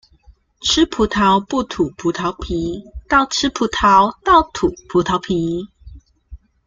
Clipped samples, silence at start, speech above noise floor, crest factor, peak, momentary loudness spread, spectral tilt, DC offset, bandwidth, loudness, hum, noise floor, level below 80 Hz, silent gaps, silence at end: under 0.1%; 0.6 s; 33 dB; 16 dB; -2 dBFS; 10 LU; -4 dB/octave; under 0.1%; 9.2 kHz; -17 LUFS; none; -50 dBFS; -38 dBFS; none; 0.3 s